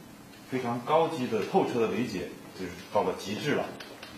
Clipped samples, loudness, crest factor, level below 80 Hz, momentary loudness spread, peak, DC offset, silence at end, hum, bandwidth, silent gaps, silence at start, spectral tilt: under 0.1%; -30 LUFS; 20 dB; -66 dBFS; 14 LU; -12 dBFS; under 0.1%; 0 s; none; 15 kHz; none; 0 s; -5.5 dB/octave